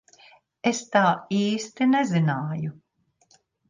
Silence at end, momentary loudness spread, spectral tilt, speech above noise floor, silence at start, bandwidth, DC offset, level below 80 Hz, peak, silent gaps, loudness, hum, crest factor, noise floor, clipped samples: 0.95 s; 9 LU; -5.5 dB/octave; 40 dB; 0.65 s; 9.8 kHz; under 0.1%; -70 dBFS; -6 dBFS; none; -24 LUFS; none; 18 dB; -63 dBFS; under 0.1%